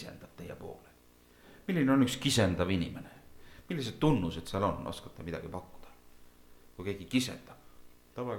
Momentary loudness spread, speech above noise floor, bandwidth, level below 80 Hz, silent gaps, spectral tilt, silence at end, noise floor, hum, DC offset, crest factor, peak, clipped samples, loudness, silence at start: 20 LU; 29 dB; 18.5 kHz; -54 dBFS; none; -5.5 dB/octave; 0 s; -61 dBFS; 60 Hz at -60 dBFS; under 0.1%; 20 dB; -14 dBFS; under 0.1%; -32 LUFS; 0 s